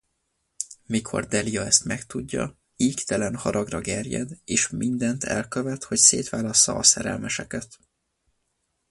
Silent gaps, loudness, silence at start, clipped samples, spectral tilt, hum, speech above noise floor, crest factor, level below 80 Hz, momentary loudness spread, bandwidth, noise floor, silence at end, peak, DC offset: none; -22 LUFS; 0.6 s; under 0.1%; -2.5 dB/octave; none; 51 dB; 24 dB; -52 dBFS; 15 LU; 11.5 kHz; -75 dBFS; 1.25 s; 0 dBFS; under 0.1%